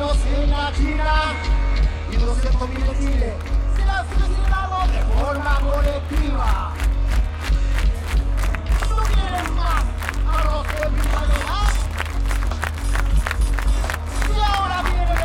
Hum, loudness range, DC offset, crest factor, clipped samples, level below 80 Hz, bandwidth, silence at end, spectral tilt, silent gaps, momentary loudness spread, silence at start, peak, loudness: none; 1 LU; under 0.1%; 14 dB; under 0.1%; -20 dBFS; 13 kHz; 0 s; -5.5 dB/octave; none; 3 LU; 0 s; -4 dBFS; -22 LUFS